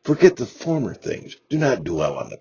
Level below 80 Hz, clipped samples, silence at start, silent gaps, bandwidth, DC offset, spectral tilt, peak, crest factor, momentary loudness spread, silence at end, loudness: -52 dBFS; under 0.1%; 0.05 s; none; 7.2 kHz; under 0.1%; -6.5 dB/octave; 0 dBFS; 20 dB; 14 LU; 0.05 s; -22 LUFS